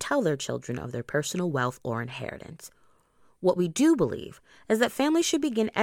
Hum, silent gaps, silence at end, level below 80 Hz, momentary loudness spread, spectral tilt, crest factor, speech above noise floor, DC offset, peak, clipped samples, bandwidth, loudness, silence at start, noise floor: none; none; 0 s; -60 dBFS; 16 LU; -5 dB/octave; 20 dB; 35 dB; under 0.1%; -8 dBFS; under 0.1%; 17 kHz; -27 LUFS; 0 s; -62 dBFS